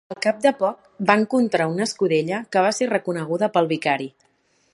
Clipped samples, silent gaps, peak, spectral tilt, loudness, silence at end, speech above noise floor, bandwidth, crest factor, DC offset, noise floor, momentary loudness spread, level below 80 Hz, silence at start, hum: under 0.1%; none; 0 dBFS; -5 dB/octave; -21 LUFS; 0.65 s; 43 dB; 11.5 kHz; 20 dB; under 0.1%; -64 dBFS; 6 LU; -70 dBFS; 0.1 s; none